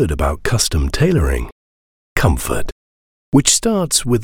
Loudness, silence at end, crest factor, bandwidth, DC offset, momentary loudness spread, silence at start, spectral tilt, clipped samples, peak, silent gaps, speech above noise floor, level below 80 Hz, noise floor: -16 LUFS; 0 s; 16 dB; 17.5 kHz; under 0.1%; 12 LU; 0 s; -4 dB/octave; under 0.1%; 0 dBFS; 1.52-2.16 s, 2.72-3.32 s; over 75 dB; -26 dBFS; under -90 dBFS